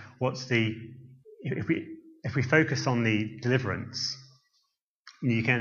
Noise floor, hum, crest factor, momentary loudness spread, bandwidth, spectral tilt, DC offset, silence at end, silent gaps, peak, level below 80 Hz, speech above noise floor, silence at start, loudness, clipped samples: -76 dBFS; none; 22 dB; 16 LU; 7.2 kHz; -5.5 dB/octave; under 0.1%; 0 s; 4.81-5.05 s; -8 dBFS; -66 dBFS; 48 dB; 0 s; -28 LUFS; under 0.1%